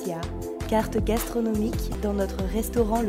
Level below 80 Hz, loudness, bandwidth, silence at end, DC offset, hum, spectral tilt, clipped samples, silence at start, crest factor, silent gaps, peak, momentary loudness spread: -34 dBFS; -27 LUFS; 16 kHz; 0 s; under 0.1%; none; -6 dB/octave; under 0.1%; 0 s; 16 dB; none; -10 dBFS; 7 LU